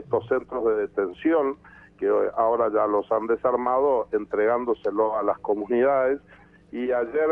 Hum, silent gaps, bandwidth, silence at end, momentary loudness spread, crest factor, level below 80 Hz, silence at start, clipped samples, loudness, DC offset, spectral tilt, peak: none; none; 3.7 kHz; 0 s; 6 LU; 14 dB; -60 dBFS; 0 s; under 0.1%; -24 LUFS; under 0.1%; -8.5 dB/octave; -10 dBFS